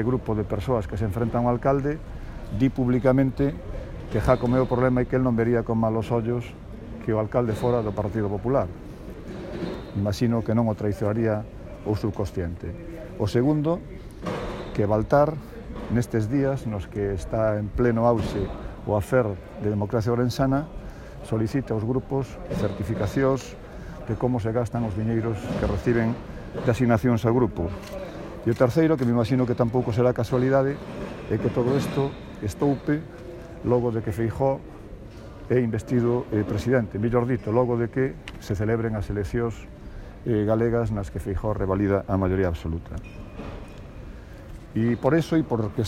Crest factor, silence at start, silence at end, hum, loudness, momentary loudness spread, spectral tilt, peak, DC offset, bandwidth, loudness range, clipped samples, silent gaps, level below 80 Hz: 20 dB; 0 s; 0 s; none; -25 LUFS; 17 LU; -8 dB/octave; -4 dBFS; under 0.1%; 15 kHz; 4 LU; under 0.1%; none; -40 dBFS